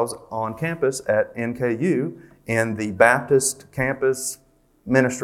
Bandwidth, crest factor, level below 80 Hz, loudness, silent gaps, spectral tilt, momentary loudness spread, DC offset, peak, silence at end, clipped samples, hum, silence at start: 16 kHz; 22 dB; -56 dBFS; -22 LUFS; none; -5 dB/octave; 12 LU; under 0.1%; 0 dBFS; 0 s; under 0.1%; none; 0 s